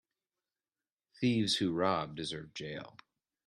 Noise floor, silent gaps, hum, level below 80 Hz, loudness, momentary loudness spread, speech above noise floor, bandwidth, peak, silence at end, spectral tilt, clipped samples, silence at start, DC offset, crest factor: under -90 dBFS; none; none; -70 dBFS; -34 LUFS; 14 LU; over 56 dB; 12.5 kHz; -14 dBFS; 0.55 s; -5 dB/octave; under 0.1%; 1.2 s; under 0.1%; 22 dB